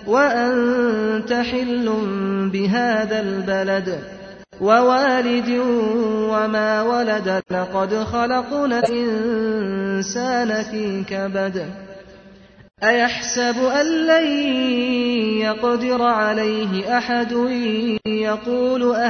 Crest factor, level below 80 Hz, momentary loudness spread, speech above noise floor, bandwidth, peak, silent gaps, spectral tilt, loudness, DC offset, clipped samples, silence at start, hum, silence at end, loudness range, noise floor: 16 dB; -54 dBFS; 6 LU; 26 dB; 8.2 kHz; -2 dBFS; none; -4.5 dB/octave; -19 LUFS; under 0.1%; under 0.1%; 0 s; none; 0 s; 4 LU; -45 dBFS